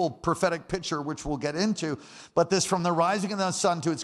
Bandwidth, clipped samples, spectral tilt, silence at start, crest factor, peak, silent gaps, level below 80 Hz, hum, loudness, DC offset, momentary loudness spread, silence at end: 13 kHz; under 0.1%; -4.5 dB/octave; 0 s; 18 dB; -10 dBFS; none; -52 dBFS; none; -27 LUFS; under 0.1%; 7 LU; 0 s